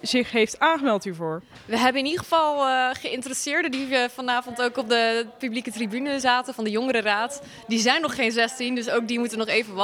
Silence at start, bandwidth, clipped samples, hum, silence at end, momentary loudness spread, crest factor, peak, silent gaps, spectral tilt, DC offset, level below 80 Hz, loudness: 0.05 s; 16.5 kHz; under 0.1%; none; 0 s; 8 LU; 20 dB; -4 dBFS; none; -3 dB/octave; under 0.1%; -66 dBFS; -24 LUFS